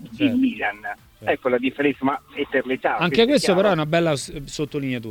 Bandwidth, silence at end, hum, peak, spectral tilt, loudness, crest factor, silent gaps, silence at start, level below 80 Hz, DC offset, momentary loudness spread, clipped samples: 17 kHz; 0 s; none; -4 dBFS; -5 dB/octave; -21 LUFS; 18 dB; none; 0 s; -52 dBFS; under 0.1%; 11 LU; under 0.1%